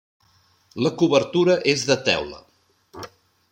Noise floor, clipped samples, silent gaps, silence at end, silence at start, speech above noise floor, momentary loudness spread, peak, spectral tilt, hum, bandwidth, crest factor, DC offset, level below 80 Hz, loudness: -60 dBFS; under 0.1%; none; 0.45 s; 0.75 s; 40 dB; 21 LU; -2 dBFS; -4.5 dB/octave; none; 16 kHz; 22 dB; under 0.1%; -60 dBFS; -20 LUFS